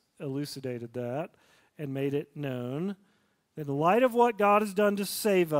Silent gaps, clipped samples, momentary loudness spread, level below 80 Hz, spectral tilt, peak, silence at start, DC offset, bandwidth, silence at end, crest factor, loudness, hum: none; under 0.1%; 15 LU; -74 dBFS; -5.5 dB/octave; -10 dBFS; 0.2 s; under 0.1%; 16 kHz; 0 s; 18 dB; -29 LUFS; none